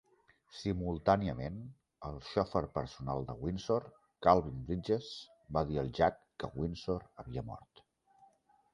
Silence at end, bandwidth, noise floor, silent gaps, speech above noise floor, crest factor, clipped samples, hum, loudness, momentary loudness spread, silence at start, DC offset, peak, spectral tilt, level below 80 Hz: 1.15 s; 11 kHz; -69 dBFS; none; 34 dB; 26 dB; under 0.1%; none; -35 LUFS; 16 LU; 0.55 s; under 0.1%; -10 dBFS; -7 dB/octave; -54 dBFS